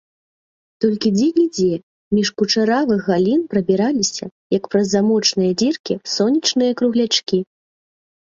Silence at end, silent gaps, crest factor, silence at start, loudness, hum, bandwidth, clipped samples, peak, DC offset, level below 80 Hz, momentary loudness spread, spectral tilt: 0.85 s; 1.83-2.11 s, 4.31-4.50 s, 5.80-5.84 s; 16 dB; 0.8 s; -18 LUFS; none; 7.6 kHz; under 0.1%; -2 dBFS; under 0.1%; -58 dBFS; 7 LU; -4.5 dB/octave